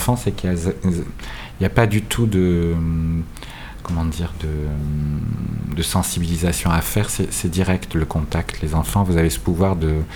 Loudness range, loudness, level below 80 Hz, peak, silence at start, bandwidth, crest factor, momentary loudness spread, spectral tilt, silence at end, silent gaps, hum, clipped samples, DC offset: 4 LU; -21 LUFS; -30 dBFS; 0 dBFS; 0 s; over 20 kHz; 20 dB; 8 LU; -5.5 dB/octave; 0 s; none; none; under 0.1%; under 0.1%